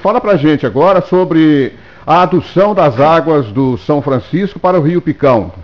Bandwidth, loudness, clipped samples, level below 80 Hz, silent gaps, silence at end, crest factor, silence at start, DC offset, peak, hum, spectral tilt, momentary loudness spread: 6.6 kHz; -11 LUFS; under 0.1%; -42 dBFS; none; 0 s; 10 dB; 0 s; 0.7%; 0 dBFS; none; -8.5 dB/octave; 5 LU